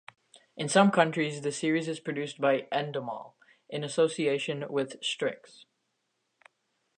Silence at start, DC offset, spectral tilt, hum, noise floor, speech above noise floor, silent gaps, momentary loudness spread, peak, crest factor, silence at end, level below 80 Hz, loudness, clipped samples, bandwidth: 0.35 s; under 0.1%; -4.5 dB/octave; none; -79 dBFS; 50 dB; none; 14 LU; -6 dBFS; 24 dB; 1.6 s; -82 dBFS; -29 LUFS; under 0.1%; 9.8 kHz